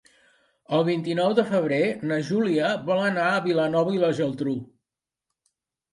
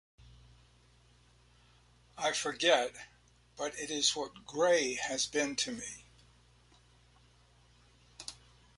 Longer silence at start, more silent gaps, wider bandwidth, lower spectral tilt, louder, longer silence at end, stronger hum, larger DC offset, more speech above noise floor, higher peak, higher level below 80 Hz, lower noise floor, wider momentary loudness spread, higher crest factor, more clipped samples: second, 0.7 s vs 2.15 s; neither; about the same, 11.5 kHz vs 11.5 kHz; first, -6.5 dB/octave vs -1 dB/octave; first, -24 LUFS vs -32 LUFS; first, 1.3 s vs 0.45 s; second, none vs 60 Hz at -65 dBFS; neither; first, 64 dB vs 31 dB; first, -8 dBFS vs -14 dBFS; about the same, -70 dBFS vs -66 dBFS; first, -87 dBFS vs -64 dBFS; second, 5 LU vs 19 LU; second, 16 dB vs 24 dB; neither